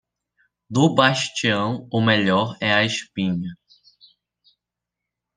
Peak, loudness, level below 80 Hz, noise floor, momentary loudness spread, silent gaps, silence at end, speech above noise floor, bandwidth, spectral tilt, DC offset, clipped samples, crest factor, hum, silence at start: -2 dBFS; -20 LUFS; -64 dBFS; -85 dBFS; 8 LU; none; 1.85 s; 65 dB; 10 kHz; -5 dB/octave; under 0.1%; under 0.1%; 20 dB; none; 0.7 s